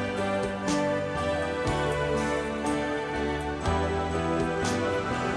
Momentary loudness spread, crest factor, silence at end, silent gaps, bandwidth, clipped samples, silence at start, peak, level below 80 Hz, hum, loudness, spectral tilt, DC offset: 2 LU; 14 dB; 0 s; none; 11 kHz; under 0.1%; 0 s; -14 dBFS; -42 dBFS; none; -28 LUFS; -5.5 dB/octave; under 0.1%